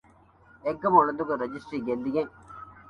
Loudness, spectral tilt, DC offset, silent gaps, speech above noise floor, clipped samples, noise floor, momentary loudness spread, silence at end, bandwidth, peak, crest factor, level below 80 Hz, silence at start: -27 LUFS; -8 dB/octave; under 0.1%; none; 31 dB; under 0.1%; -57 dBFS; 15 LU; 0.1 s; 10 kHz; -6 dBFS; 22 dB; -62 dBFS; 0.65 s